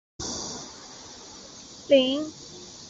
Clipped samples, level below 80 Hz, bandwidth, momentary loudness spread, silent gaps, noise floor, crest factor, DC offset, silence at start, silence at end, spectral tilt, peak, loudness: under 0.1%; -58 dBFS; 8 kHz; 21 LU; none; -45 dBFS; 22 dB; under 0.1%; 0.2 s; 0 s; -3 dB/octave; -6 dBFS; -26 LUFS